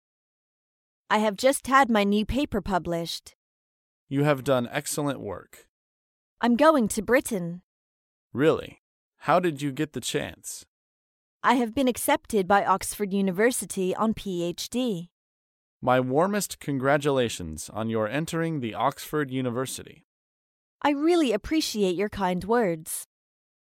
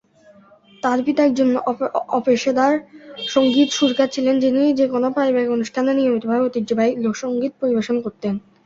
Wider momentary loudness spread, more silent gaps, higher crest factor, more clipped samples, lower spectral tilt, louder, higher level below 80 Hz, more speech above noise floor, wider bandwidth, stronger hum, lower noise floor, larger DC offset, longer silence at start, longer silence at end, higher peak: first, 12 LU vs 7 LU; first, 3.35-4.07 s, 5.69-6.37 s, 7.63-8.30 s, 8.79-9.12 s, 10.68-11.40 s, 15.11-15.80 s, 20.04-20.79 s vs none; about the same, 20 dB vs 16 dB; neither; about the same, -4.5 dB/octave vs -4.5 dB/octave; second, -26 LUFS vs -19 LUFS; first, -52 dBFS vs -62 dBFS; first, over 65 dB vs 32 dB; first, 17 kHz vs 7.8 kHz; neither; first, under -90 dBFS vs -50 dBFS; neither; first, 1.1 s vs 0.85 s; first, 0.65 s vs 0.25 s; second, -6 dBFS vs -2 dBFS